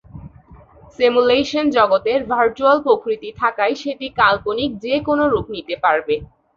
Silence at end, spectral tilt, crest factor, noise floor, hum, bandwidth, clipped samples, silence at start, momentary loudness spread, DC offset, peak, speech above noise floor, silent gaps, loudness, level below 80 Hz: 0.3 s; -5.5 dB/octave; 16 dB; -45 dBFS; none; 7.2 kHz; under 0.1%; 0.15 s; 8 LU; under 0.1%; -2 dBFS; 28 dB; none; -18 LUFS; -48 dBFS